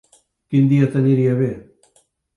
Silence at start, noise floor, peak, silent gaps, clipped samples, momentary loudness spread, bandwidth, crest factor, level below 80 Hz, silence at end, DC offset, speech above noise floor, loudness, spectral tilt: 0.5 s; -61 dBFS; -4 dBFS; none; under 0.1%; 8 LU; 10.5 kHz; 14 dB; -58 dBFS; 0.75 s; under 0.1%; 45 dB; -17 LUFS; -10 dB/octave